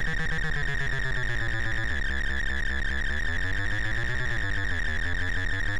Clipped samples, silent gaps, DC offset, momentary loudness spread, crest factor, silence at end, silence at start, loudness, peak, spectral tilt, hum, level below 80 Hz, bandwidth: under 0.1%; none; under 0.1%; 0 LU; 8 dB; 0 s; 0 s; -29 LUFS; -18 dBFS; -4.5 dB/octave; none; -32 dBFS; 11.5 kHz